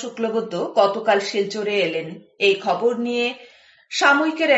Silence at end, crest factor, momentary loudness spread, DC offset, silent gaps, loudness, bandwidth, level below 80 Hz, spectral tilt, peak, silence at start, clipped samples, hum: 0 s; 18 dB; 9 LU; under 0.1%; none; -20 LUFS; 8.2 kHz; -74 dBFS; -3.5 dB/octave; -2 dBFS; 0 s; under 0.1%; none